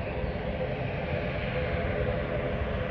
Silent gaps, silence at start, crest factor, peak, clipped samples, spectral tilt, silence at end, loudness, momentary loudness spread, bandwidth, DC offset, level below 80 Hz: none; 0 s; 16 dB; -16 dBFS; under 0.1%; -9 dB/octave; 0 s; -31 LUFS; 3 LU; 6 kHz; under 0.1%; -38 dBFS